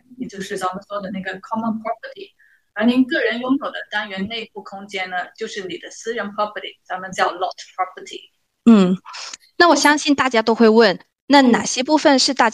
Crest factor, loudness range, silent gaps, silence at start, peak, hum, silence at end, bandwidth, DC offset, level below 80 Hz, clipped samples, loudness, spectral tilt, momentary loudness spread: 18 dB; 11 LU; 11.21-11.27 s; 0.1 s; -2 dBFS; none; 0 s; 12.5 kHz; under 0.1%; -64 dBFS; under 0.1%; -18 LUFS; -4 dB/octave; 18 LU